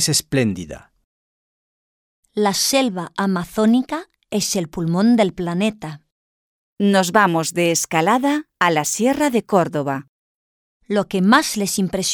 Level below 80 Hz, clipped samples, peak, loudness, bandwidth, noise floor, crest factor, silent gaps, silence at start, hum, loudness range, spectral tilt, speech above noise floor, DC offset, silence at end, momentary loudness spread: -54 dBFS; under 0.1%; -2 dBFS; -18 LUFS; over 20 kHz; under -90 dBFS; 18 dB; 1.04-2.23 s, 6.12-6.77 s, 10.09-10.80 s; 0 s; none; 3 LU; -4 dB/octave; over 72 dB; under 0.1%; 0 s; 11 LU